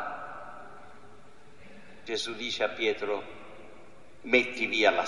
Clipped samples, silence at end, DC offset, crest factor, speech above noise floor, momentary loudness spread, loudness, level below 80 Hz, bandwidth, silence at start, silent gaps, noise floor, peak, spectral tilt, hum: under 0.1%; 0 s; 0.5%; 24 dB; 27 dB; 25 LU; -29 LUFS; -68 dBFS; 11.5 kHz; 0 s; none; -55 dBFS; -8 dBFS; -3 dB/octave; none